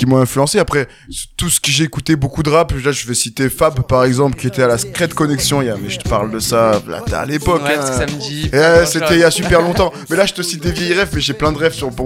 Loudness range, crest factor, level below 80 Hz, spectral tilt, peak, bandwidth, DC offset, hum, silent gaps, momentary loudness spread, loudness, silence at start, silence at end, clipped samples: 3 LU; 14 dB; -32 dBFS; -4.5 dB/octave; 0 dBFS; 17 kHz; under 0.1%; none; none; 8 LU; -15 LUFS; 0 s; 0 s; under 0.1%